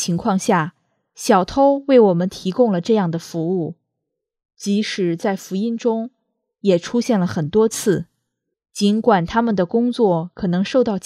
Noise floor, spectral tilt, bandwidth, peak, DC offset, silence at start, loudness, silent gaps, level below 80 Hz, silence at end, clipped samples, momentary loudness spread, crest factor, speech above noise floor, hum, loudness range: -79 dBFS; -6 dB/octave; 14.5 kHz; 0 dBFS; under 0.1%; 0 s; -19 LUFS; none; -52 dBFS; 0.05 s; under 0.1%; 9 LU; 18 dB; 62 dB; none; 5 LU